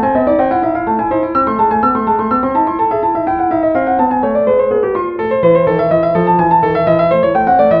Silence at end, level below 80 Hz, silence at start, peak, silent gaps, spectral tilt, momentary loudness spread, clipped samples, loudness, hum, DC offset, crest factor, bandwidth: 0 s; -40 dBFS; 0 s; 0 dBFS; none; -10.5 dB/octave; 4 LU; under 0.1%; -13 LUFS; none; under 0.1%; 12 dB; 5.2 kHz